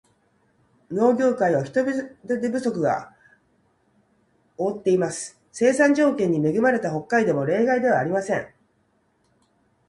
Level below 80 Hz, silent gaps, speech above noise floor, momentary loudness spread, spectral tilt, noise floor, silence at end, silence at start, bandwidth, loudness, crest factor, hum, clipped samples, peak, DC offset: -66 dBFS; none; 45 dB; 10 LU; -6 dB/octave; -66 dBFS; 1.4 s; 0.9 s; 11.5 kHz; -22 LUFS; 18 dB; none; under 0.1%; -6 dBFS; under 0.1%